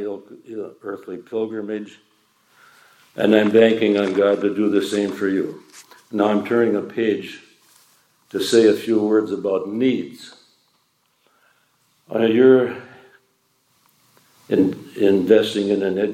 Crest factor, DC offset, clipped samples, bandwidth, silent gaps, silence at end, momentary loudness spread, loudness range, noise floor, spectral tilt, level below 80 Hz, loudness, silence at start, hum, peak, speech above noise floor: 20 dB; under 0.1%; under 0.1%; 15.5 kHz; none; 0 s; 19 LU; 5 LU; -65 dBFS; -6 dB/octave; -74 dBFS; -19 LUFS; 0 s; none; 0 dBFS; 46 dB